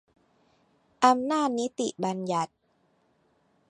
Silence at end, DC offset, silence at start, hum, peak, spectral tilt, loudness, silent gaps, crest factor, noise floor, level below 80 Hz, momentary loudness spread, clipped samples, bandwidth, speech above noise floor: 1.25 s; under 0.1%; 1 s; none; -6 dBFS; -4.5 dB/octave; -27 LUFS; none; 24 dB; -69 dBFS; -78 dBFS; 8 LU; under 0.1%; 11 kHz; 43 dB